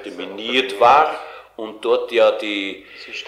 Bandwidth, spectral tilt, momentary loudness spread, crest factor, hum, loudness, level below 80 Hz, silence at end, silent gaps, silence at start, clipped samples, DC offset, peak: 13.5 kHz; -3.5 dB/octave; 20 LU; 18 dB; none; -17 LUFS; -60 dBFS; 0 s; none; 0 s; under 0.1%; under 0.1%; -2 dBFS